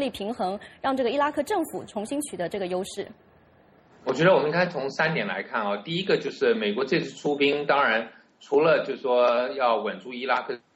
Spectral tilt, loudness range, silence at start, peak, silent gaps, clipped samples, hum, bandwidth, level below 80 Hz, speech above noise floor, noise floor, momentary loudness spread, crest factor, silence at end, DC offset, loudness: -5 dB/octave; 5 LU; 0 s; -6 dBFS; none; under 0.1%; none; 16 kHz; -66 dBFS; 32 dB; -57 dBFS; 10 LU; 18 dB; 0.2 s; under 0.1%; -25 LUFS